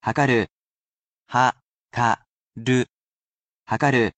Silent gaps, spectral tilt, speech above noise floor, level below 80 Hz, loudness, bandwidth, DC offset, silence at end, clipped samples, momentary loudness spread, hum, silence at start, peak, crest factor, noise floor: 0.50-1.26 s, 1.62-1.89 s, 2.29-2.51 s, 2.93-3.63 s; -5.5 dB/octave; over 69 dB; -58 dBFS; -23 LUFS; 8.8 kHz; under 0.1%; 0.1 s; under 0.1%; 12 LU; none; 0.05 s; -4 dBFS; 20 dB; under -90 dBFS